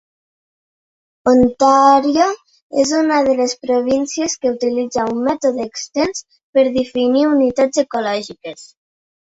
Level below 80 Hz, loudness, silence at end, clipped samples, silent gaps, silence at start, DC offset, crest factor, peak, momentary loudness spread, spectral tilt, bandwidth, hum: -52 dBFS; -16 LUFS; 0.7 s; under 0.1%; 2.62-2.70 s, 6.43-6.53 s; 1.25 s; under 0.1%; 16 dB; 0 dBFS; 11 LU; -3.5 dB/octave; 8 kHz; none